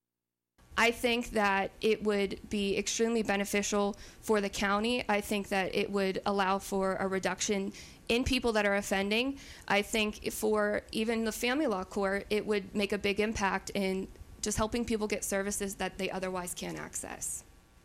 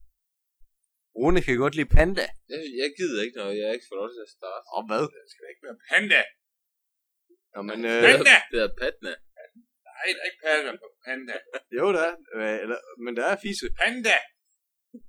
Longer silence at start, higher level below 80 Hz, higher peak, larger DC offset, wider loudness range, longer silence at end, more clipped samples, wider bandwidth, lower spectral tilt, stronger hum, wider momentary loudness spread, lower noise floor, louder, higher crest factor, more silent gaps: second, 0.7 s vs 1.15 s; second, -52 dBFS vs -34 dBFS; second, -16 dBFS vs 0 dBFS; neither; second, 3 LU vs 9 LU; first, 0.4 s vs 0 s; neither; first, 16 kHz vs 13.5 kHz; about the same, -3.5 dB/octave vs -4 dB/octave; neither; second, 8 LU vs 19 LU; first, under -90 dBFS vs -81 dBFS; second, -31 LUFS vs -23 LUFS; second, 16 dB vs 26 dB; neither